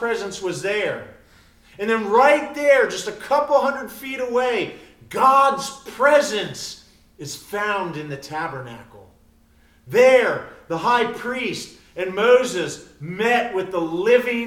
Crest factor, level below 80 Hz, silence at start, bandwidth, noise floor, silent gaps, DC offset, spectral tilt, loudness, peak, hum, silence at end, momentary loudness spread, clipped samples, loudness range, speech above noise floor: 18 dB; -58 dBFS; 0 s; 16.5 kHz; -55 dBFS; none; under 0.1%; -4 dB/octave; -20 LUFS; -2 dBFS; none; 0 s; 16 LU; under 0.1%; 4 LU; 35 dB